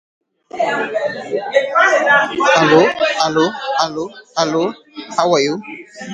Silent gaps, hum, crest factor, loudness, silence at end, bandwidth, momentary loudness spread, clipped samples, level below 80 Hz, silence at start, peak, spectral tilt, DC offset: none; none; 16 dB; -15 LUFS; 0 s; 9.6 kHz; 14 LU; under 0.1%; -60 dBFS; 0.55 s; 0 dBFS; -4 dB/octave; under 0.1%